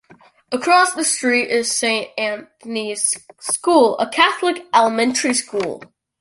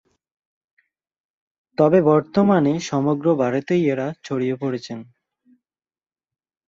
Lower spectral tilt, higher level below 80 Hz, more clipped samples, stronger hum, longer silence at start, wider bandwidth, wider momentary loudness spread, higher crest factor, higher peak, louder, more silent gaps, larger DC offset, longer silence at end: second, -1.5 dB/octave vs -7 dB/octave; about the same, -66 dBFS vs -64 dBFS; neither; neither; second, 0.5 s vs 1.8 s; first, 12 kHz vs 7.8 kHz; about the same, 11 LU vs 12 LU; about the same, 18 dB vs 20 dB; about the same, -2 dBFS vs -2 dBFS; about the same, -18 LUFS vs -20 LUFS; neither; neither; second, 0.35 s vs 1.65 s